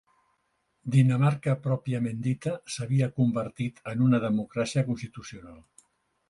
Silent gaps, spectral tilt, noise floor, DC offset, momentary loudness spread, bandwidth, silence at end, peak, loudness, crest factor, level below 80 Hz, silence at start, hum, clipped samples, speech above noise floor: none; -7.5 dB/octave; -74 dBFS; under 0.1%; 13 LU; 11 kHz; 0.7 s; -10 dBFS; -27 LUFS; 18 dB; -62 dBFS; 0.85 s; none; under 0.1%; 48 dB